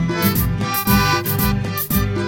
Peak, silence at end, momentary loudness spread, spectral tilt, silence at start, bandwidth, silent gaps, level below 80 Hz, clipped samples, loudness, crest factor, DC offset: -2 dBFS; 0 s; 4 LU; -5 dB/octave; 0 s; 17 kHz; none; -30 dBFS; under 0.1%; -18 LUFS; 16 dB; under 0.1%